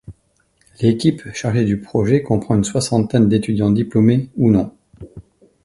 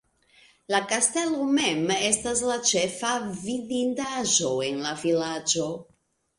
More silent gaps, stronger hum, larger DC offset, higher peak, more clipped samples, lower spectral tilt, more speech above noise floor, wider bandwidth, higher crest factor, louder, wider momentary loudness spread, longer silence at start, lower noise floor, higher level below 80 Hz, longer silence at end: neither; neither; neither; first, 0 dBFS vs -6 dBFS; neither; first, -7 dB/octave vs -2.5 dB/octave; first, 45 dB vs 33 dB; about the same, 11.5 kHz vs 11.5 kHz; about the same, 16 dB vs 20 dB; first, -17 LUFS vs -25 LUFS; second, 4 LU vs 7 LU; second, 0.1 s vs 0.7 s; about the same, -61 dBFS vs -59 dBFS; first, -44 dBFS vs -62 dBFS; about the same, 0.45 s vs 0.55 s